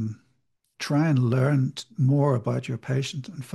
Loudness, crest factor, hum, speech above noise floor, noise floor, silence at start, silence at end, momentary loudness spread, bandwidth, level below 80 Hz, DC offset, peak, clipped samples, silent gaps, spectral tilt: -25 LUFS; 16 dB; none; 49 dB; -72 dBFS; 0 s; 0 s; 13 LU; 12 kHz; -66 dBFS; under 0.1%; -10 dBFS; under 0.1%; none; -7 dB/octave